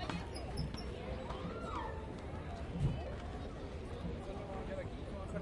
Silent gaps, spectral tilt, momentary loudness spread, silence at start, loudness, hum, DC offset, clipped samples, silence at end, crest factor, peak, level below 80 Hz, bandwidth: none; -7 dB/octave; 7 LU; 0 s; -43 LUFS; none; under 0.1%; under 0.1%; 0 s; 18 dB; -24 dBFS; -48 dBFS; 11.5 kHz